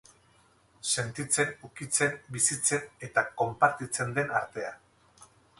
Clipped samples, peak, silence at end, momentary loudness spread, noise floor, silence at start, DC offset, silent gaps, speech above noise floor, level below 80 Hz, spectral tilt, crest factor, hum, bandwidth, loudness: under 0.1%; -8 dBFS; 0.35 s; 11 LU; -63 dBFS; 0.85 s; under 0.1%; none; 34 dB; -66 dBFS; -2.5 dB/octave; 24 dB; none; 12 kHz; -29 LUFS